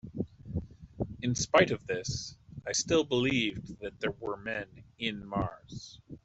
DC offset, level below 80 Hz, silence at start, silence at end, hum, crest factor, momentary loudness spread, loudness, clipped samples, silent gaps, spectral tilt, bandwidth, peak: under 0.1%; -54 dBFS; 0.05 s; 0.05 s; none; 24 dB; 18 LU; -32 LUFS; under 0.1%; none; -4 dB/octave; 8.2 kHz; -8 dBFS